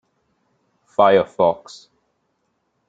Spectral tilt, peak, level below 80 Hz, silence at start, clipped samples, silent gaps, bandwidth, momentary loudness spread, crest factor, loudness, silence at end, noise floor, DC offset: -6 dB/octave; -2 dBFS; -66 dBFS; 1 s; under 0.1%; none; 7.8 kHz; 12 LU; 20 dB; -17 LUFS; 1.35 s; -70 dBFS; under 0.1%